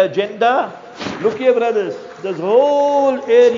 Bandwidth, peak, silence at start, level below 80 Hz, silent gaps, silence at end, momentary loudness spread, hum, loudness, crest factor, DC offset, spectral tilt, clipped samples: 7.6 kHz; -2 dBFS; 0 s; -62 dBFS; none; 0 s; 13 LU; none; -16 LUFS; 14 dB; under 0.1%; -5 dB/octave; under 0.1%